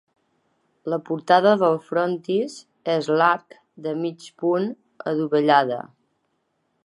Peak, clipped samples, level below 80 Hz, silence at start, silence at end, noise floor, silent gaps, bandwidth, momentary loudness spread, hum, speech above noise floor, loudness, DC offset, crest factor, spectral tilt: -2 dBFS; under 0.1%; -78 dBFS; 0.85 s; 1.05 s; -72 dBFS; none; 11.5 kHz; 15 LU; none; 50 dB; -22 LUFS; under 0.1%; 20 dB; -6 dB/octave